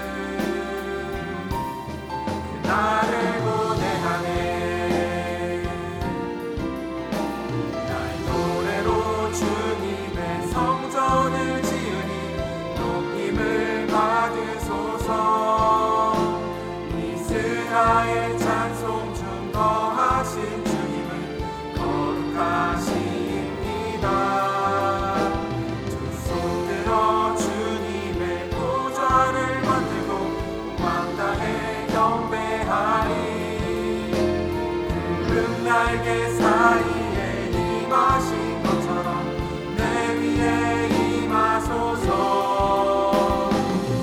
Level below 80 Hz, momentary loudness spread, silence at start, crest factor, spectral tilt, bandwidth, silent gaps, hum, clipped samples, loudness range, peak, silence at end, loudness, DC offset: -40 dBFS; 8 LU; 0 s; 20 dB; -5.5 dB/octave; 18 kHz; none; none; under 0.1%; 4 LU; -4 dBFS; 0 s; -23 LUFS; under 0.1%